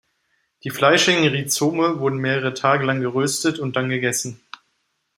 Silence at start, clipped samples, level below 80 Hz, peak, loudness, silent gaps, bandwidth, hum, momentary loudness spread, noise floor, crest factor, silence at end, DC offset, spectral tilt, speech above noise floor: 0.65 s; under 0.1%; -64 dBFS; -2 dBFS; -19 LUFS; none; 16 kHz; none; 10 LU; -71 dBFS; 20 dB; 0.8 s; under 0.1%; -4 dB/octave; 51 dB